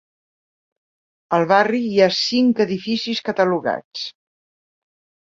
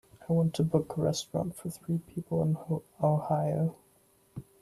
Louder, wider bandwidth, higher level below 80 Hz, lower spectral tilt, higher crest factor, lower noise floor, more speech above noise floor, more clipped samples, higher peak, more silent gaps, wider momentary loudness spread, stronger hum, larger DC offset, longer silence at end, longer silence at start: first, -18 LUFS vs -31 LUFS; second, 7.6 kHz vs 13.5 kHz; about the same, -64 dBFS vs -62 dBFS; second, -5 dB/octave vs -7.5 dB/octave; about the same, 20 dB vs 18 dB; first, under -90 dBFS vs -65 dBFS; first, over 72 dB vs 35 dB; neither; first, -2 dBFS vs -14 dBFS; first, 3.85-3.91 s vs none; about the same, 10 LU vs 9 LU; neither; neither; first, 1.2 s vs 0.2 s; first, 1.3 s vs 0.2 s